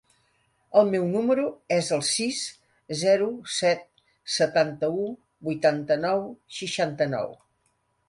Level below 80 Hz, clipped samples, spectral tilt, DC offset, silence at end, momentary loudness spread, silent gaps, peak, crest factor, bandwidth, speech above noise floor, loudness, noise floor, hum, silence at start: -68 dBFS; under 0.1%; -4 dB/octave; under 0.1%; 0.75 s; 12 LU; none; -6 dBFS; 20 dB; 11.5 kHz; 46 dB; -25 LUFS; -71 dBFS; none; 0.7 s